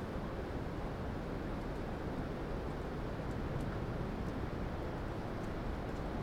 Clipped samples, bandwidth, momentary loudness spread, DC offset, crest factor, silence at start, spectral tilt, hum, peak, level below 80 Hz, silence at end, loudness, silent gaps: under 0.1%; 16.5 kHz; 2 LU; under 0.1%; 12 dB; 0 s; -7.5 dB/octave; none; -28 dBFS; -46 dBFS; 0 s; -41 LUFS; none